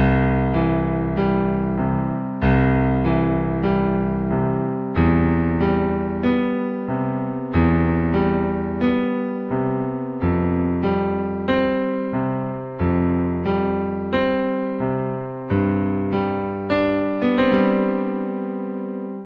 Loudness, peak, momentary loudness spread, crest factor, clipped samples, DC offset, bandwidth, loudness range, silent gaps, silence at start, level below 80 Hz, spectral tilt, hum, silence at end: -21 LUFS; -4 dBFS; 7 LU; 16 dB; under 0.1%; under 0.1%; 5.2 kHz; 2 LU; none; 0 s; -34 dBFS; -10.5 dB/octave; none; 0 s